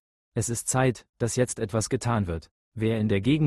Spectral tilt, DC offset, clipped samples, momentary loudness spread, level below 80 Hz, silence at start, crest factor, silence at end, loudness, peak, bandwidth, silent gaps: -5.5 dB/octave; under 0.1%; under 0.1%; 8 LU; -52 dBFS; 0.35 s; 18 dB; 0 s; -27 LUFS; -8 dBFS; 12.5 kHz; 1.09-1.13 s, 2.51-2.72 s